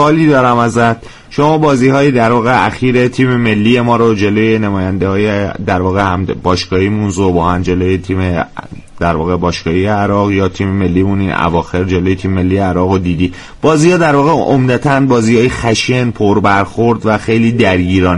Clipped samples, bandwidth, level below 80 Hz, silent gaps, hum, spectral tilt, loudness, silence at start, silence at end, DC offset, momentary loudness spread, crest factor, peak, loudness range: under 0.1%; 11.5 kHz; -34 dBFS; none; none; -6.5 dB/octave; -12 LUFS; 0 s; 0 s; under 0.1%; 5 LU; 10 dB; 0 dBFS; 4 LU